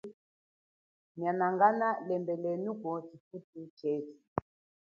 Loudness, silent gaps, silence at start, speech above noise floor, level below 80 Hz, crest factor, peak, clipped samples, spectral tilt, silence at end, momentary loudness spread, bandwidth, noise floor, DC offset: -33 LUFS; 0.14-1.15 s, 3.20-3.31 s, 3.44-3.53 s, 3.70-3.77 s, 4.28-4.36 s; 0.05 s; over 57 dB; -70 dBFS; 22 dB; -12 dBFS; under 0.1%; -7 dB/octave; 0.45 s; 22 LU; 6.8 kHz; under -90 dBFS; under 0.1%